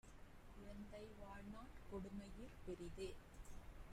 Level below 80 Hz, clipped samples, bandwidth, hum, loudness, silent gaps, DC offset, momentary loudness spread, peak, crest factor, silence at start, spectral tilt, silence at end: -60 dBFS; under 0.1%; 15.5 kHz; none; -57 LUFS; none; under 0.1%; 9 LU; -40 dBFS; 14 dB; 0.05 s; -6 dB/octave; 0 s